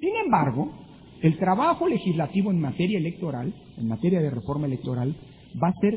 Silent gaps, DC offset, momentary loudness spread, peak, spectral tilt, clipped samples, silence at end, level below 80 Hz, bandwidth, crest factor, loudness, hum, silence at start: none; under 0.1%; 10 LU; -8 dBFS; -12 dB/octave; under 0.1%; 0 s; -56 dBFS; 4 kHz; 18 dB; -25 LUFS; none; 0 s